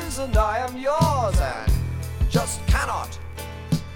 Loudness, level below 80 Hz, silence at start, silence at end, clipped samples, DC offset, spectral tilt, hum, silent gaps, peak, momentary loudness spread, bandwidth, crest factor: -24 LUFS; -28 dBFS; 0 s; 0 s; under 0.1%; under 0.1%; -5.5 dB/octave; none; none; -6 dBFS; 11 LU; 17.5 kHz; 18 dB